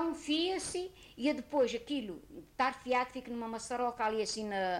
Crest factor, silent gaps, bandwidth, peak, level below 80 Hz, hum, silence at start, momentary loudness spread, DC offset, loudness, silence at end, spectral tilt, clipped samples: 14 dB; none; 16 kHz; -20 dBFS; -64 dBFS; none; 0 s; 9 LU; under 0.1%; -35 LUFS; 0 s; -3 dB/octave; under 0.1%